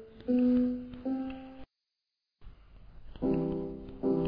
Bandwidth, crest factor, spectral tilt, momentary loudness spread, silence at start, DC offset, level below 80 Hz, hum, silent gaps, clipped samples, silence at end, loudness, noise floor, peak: 5.2 kHz; 14 dB; -11 dB/octave; 14 LU; 0 s; under 0.1%; -52 dBFS; none; none; under 0.1%; 0 s; -32 LUFS; -87 dBFS; -20 dBFS